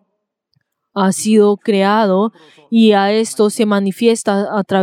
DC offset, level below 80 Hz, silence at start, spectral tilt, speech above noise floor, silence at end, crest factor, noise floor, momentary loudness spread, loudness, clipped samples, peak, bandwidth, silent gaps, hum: under 0.1%; -72 dBFS; 0.95 s; -5 dB/octave; 58 dB; 0 s; 14 dB; -72 dBFS; 6 LU; -14 LUFS; under 0.1%; 0 dBFS; 15.5 kHz; none; none